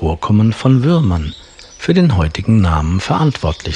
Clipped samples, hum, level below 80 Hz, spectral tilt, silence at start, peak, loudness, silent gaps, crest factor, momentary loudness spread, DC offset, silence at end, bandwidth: under 0.1%; none; -30 dBFS; -7.5 dB/octave; 0 s; 0 dBFS; -14 LUFS; none; 14 dB; 9 LU; under 0.1%; 0 s; 10 kHz